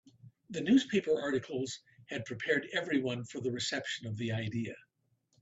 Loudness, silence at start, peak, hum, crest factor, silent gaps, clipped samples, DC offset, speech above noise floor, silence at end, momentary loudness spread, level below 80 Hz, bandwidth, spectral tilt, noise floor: -34 LUFS; 0.25 s; -16 dBFS; none; 18 dB; none; under 0.1%; under 0.1%; 43 dB; 0.6 s; 14 LU; -72 dBFS; 8 kHz; -5 dB/octave; -76 dBFS